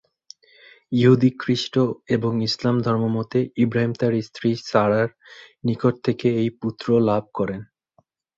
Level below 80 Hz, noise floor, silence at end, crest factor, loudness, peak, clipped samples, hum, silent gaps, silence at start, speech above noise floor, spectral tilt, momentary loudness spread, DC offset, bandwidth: -58 dBFS; -64 dBFS; 0.75 s; 18 dB; -22 LUFS; -4 dBFS; under 0.1%; none; none; 0.9 s; 43 dB; -7 dB/octave; 8 LU; under 0.1%; 7.8 kHz